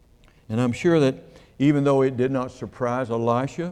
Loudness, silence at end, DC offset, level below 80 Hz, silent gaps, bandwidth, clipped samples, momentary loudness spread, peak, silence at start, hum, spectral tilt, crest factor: -23 LUFS; 0 s; under 0.1%; -54 dBFS; none; 10.5 kHz; under 0.1%; 9 LU; -8 dBFS; 0.5 s; none; -7.5 dB/octave; 16 dB